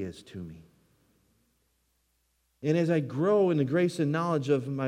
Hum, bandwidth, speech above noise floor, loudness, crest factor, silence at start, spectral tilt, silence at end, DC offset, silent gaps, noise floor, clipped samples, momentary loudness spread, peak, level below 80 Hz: none; 13 kHz; 46 dB; -27 LUFS; 16 dB; 0 s; -7.5 dB/octave; 0 s; under 0.1%; none; -73 dBFS; under 0.1%; 18 LU; -14 dBFS; -72 dBFS